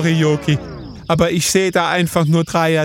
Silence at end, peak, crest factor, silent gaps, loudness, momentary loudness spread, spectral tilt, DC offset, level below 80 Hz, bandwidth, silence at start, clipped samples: 0 s; -2 dBFS; 14 dB; none; -16 LUFS; 6 LU; -5 dB/octave; under 0.1%; -42 dBFS; 17 kHz; 0 s; under 0.1%